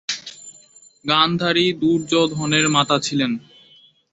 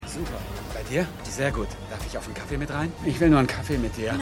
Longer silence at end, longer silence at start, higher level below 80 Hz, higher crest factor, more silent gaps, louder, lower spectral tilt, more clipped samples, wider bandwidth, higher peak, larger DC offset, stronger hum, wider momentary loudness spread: first, 0.75 s vs 0 s; about the same, 0.1 s vs 0 s; second, -60 dBFS vs -38 dBFS; about the same, 20 dB vs 20 dB; neither; first, -18 LUFS vs -27 LUFS; second, -4 dB/octave vs -6 dB/octave; neither; second, 8.2 kHz vs 16.5 kHz; first, -2 dBFS vs -6 dBFS; neither; neither; about the same, 14 LU vs 14 LU